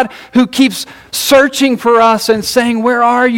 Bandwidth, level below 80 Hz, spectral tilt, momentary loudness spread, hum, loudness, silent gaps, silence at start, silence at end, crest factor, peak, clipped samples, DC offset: 17 kHz; -48 dBFS; -3 dB/octave; 5 LU; none; -11 LUFS; none; 0 s; 0 s; 10 dB; 0 dBFS; under 0.1%; under 0.1%